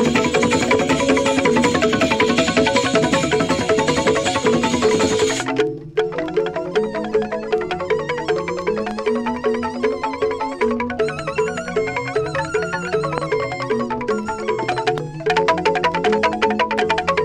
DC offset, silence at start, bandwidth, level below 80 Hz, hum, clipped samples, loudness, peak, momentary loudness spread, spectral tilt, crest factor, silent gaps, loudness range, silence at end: under 0.1%; 0 s; 12 kHz; -46 dBFS; none; under 0.1%; -19 LUFS; -2 dBFS; 6 LU; -4.5 dB/octave; 16 dB; none; 5 LU; 0 s